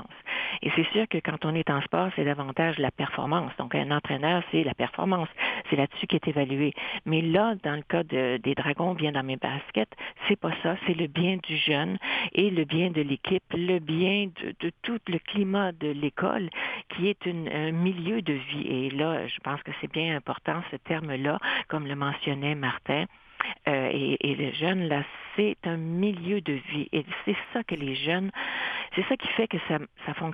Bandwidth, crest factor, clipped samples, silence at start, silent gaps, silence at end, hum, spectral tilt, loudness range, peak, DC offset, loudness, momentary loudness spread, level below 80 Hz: 5 kHz; 22 dB; under 0.1%; 0 s; none; 0 s; none; -9 dB/octave; 3 LU; -6 dBFS; under 0.1%; -28 LUFS; 6 LU; -64 dBFS